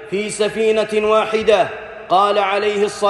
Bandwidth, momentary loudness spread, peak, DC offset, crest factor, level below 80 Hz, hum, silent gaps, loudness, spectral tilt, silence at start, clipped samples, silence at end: 12 kHz; 6 LU; -2 dBFS; under 0.1%; 14 dB; -52 dBFS; none; none; -17 LUFS; -3.5 dB/octave; 0 s; under 0.1%; 0 s